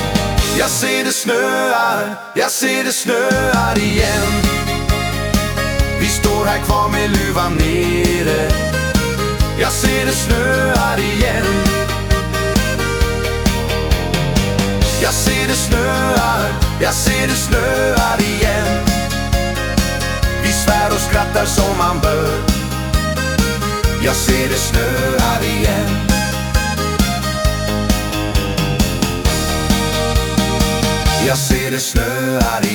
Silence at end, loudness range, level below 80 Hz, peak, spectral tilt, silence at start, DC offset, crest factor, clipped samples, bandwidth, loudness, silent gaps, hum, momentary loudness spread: 0 s; 2 LU; -22 dBFS; 0 dBFS; -4 dB/octave; 0 s; under 0.1%; 14 dB; under 0.1%; over 20 kHz; -16 LUFS; none; none; 3 LU